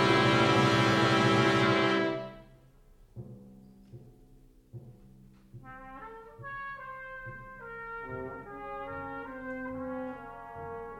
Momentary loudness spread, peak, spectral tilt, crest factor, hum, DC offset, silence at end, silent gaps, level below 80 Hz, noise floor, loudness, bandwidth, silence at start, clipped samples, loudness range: 24 LU; -12 dBFS; -5.5 dB/octave; 20 dB; none; under 0.1%; 0 s; none; -58 dBFS; -58 dBFS; -28 LUFS; 13.5 kHz; 0 s; under 0.1%; 24 LU